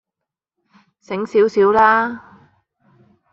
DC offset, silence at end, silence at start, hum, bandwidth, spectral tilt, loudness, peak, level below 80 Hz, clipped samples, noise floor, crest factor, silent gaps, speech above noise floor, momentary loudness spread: under 0.1%; 1.15 s; 1.1 s; none; 7.4 kHz; -6 dB/octave; -16 LUFS; -2 dBFS; -58 dBFS; under 0.1%; -83 dBFS; 18 dB; none; 68 dB; 15 LU